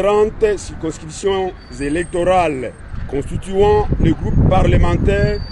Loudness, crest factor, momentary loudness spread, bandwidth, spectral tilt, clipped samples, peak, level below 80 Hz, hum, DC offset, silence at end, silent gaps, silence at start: -17 LUFS; 14 dB; 12 LU; 11.5 kHz; -7 dB/octave; under 0.1%; -2 dBFS; -22 dBFS; none; under 0.1%; 0 s; none; 0 s